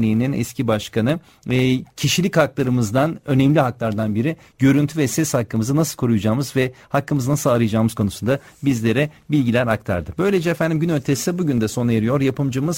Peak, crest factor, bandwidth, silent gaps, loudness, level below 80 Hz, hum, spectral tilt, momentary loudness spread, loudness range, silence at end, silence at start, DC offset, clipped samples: -4 dBFS; 16 dB; 16.5 kHz; none; -20 LUFS; -48 dBFS; none; -6 dB/octave; 5 LU; 1 LU; 0 s; 0 s; under 0.1%; under 0.1%